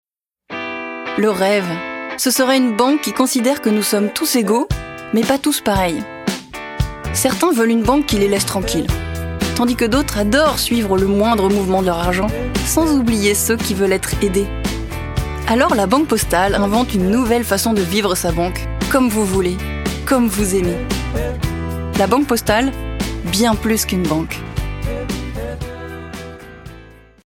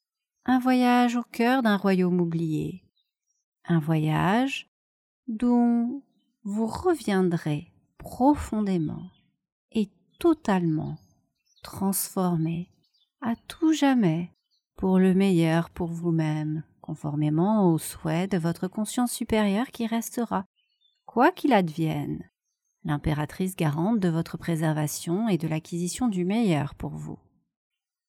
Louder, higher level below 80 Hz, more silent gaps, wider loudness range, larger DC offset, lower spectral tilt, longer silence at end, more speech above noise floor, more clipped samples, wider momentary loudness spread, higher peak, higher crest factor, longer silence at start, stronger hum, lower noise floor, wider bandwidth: first, -17 LUFS vs -26 LUFS; first, -30 dBFS vs -54 dBFS; second, none vs 3.44-3.52 s, 4.68-5.23 s, 9.52-9.69 s, 20.46-20.54 s; about the same, 3 LU vs 4 LU; neither; second, -4.5 dB/octave vs -6.5 dB/octave; second, 0.35 s vs 0.95 s; second, 26 dB vs 56 dB; neither; second, 10 LU vs 14 LU; first, -2 dBFS vs -6 dBFS; second, 14 dB vs 20 dB; about the same, 0.5 s vs 0.45 s; neither; second, -41 dBFS vs -80 dBFS; about the same, 17.5 kHz vs 17.5 kHz